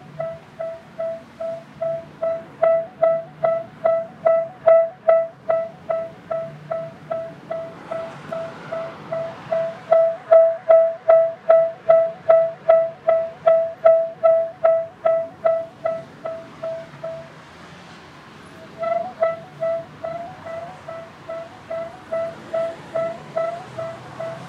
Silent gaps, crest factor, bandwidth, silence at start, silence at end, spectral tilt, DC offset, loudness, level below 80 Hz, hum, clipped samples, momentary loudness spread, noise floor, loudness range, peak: none; 20 dB; 6.2 kHz; 0 s; 0 s; -6.5 dB/octave; under 0.1%; -21 LUFS; -66 dBFS; none; under 0.1%; 17 LU; -42 dBFS; 13 LU; -2 dBFS